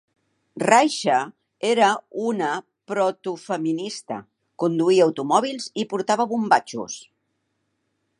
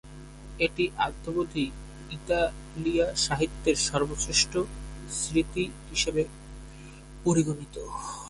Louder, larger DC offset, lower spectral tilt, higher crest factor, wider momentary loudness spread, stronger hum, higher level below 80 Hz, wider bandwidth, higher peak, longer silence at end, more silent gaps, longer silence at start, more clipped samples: first, -22 LUFS vs -28 LUFS; neither; about the same, -4 dB/octave vs -3.5 dB/octave; about the same, 22 dB vs 18 dB; second, 14 LU vs 20 LU; neither; second, -76 dBFS vs -44 dBFS; about the same, 11.5 kHz vs 11.5 kHz; first, 0 dBFS vs -10 dBFS; first, 1.15 s vs 0 s; neither; first, 0.55 s vs 0.05 s; neither